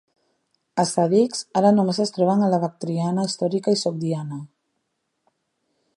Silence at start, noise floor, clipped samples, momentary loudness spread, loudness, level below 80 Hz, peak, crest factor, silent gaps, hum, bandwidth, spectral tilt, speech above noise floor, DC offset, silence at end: 0.75 s; -75 dBFS; under 0.1%; 9 LU; -21 LUFS; -72 dBFS; -4 dBFS; 18 dB; none; none; 11 kHz; -6 dB/octave; 54 dB; under 0.1%; 1.5 s